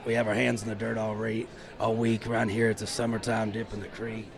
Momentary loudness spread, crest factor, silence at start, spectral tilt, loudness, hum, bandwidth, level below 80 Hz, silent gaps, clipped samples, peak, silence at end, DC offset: 10 LU; 18 dB; 0 s; -5.5 dB/octave; -29 LUFS; none; 13 kHz; -54 dBFS; none; under 0.1%; -12 dBFS; 0 s; under 0.1%